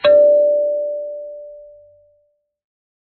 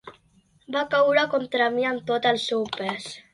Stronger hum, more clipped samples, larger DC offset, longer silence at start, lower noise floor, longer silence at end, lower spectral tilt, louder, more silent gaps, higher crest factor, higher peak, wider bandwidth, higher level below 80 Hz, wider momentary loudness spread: neither; neither; neither; about the same, 0.05 s vs 0.05 s; about the same, -64 dBFS vs -61 dBFS; first, 1.4 s vs 0.15 s; second, -1 dB/octave vs -4 dB/octave; first, -15 LUFS vs -24 LUFS; neither; about the same, 16 dB vs 18 dB; first, -2 dBFS vs -6 dBFS; second, 4.5 kHz vs 11.5 kHz; about the same, -64 dBFS vs -68 dBFS; first, 24 LU vs 10 LU